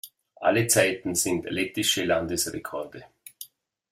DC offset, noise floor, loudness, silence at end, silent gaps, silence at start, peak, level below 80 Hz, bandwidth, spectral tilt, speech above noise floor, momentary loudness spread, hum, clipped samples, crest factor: under 0.1%; -48 dBFS; -25 LUFS; 0.45 s; none; 0.05 s; -6 dBFS; -60 dBFS; 16 kHz; -3 dB/octave; 22 dB; 22 LU; none; under 0.1%; 22 dB